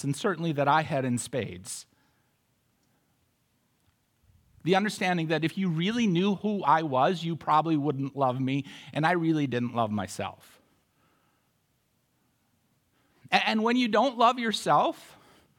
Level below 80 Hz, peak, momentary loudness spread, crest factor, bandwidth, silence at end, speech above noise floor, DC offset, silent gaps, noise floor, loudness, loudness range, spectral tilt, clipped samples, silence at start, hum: -74 dBFS; -6 dBFS; 10 LU; 22 dB; 17 kHz; 0.55 s; 46 dB; under 0.1%; none; -72 dBFS; -27 LUFS; 11 LU; -5.5 dB/octave; under 0.1%; 0 s; none